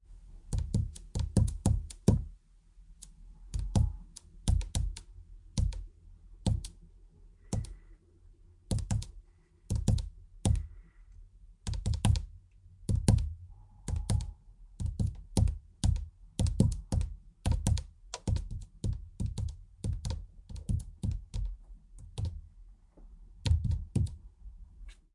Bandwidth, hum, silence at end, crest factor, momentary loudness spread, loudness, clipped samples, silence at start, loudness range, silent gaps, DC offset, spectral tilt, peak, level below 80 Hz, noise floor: 11.5 kHz; none; 0.2 s; 24 dB; 20 LU; -34 LUFS; under 0.1%; 0.1 s; 6 LU; none; under 0.1%; -6.5 dB/octave; -10 dBFS; -38 dBFS; -61 dBFS